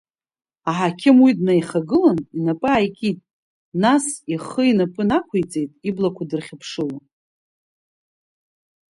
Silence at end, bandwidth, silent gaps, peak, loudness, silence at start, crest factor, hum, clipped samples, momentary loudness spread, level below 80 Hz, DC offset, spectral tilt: 1.9 s; 11.5 kHz; 3.33-3.72 s; -2 dBFS; -20 LUFS; 0.65 s; 18 dB; none; under 0.1%; 13 LU; -56 dBFS; under 0.1%; -6 dB/octave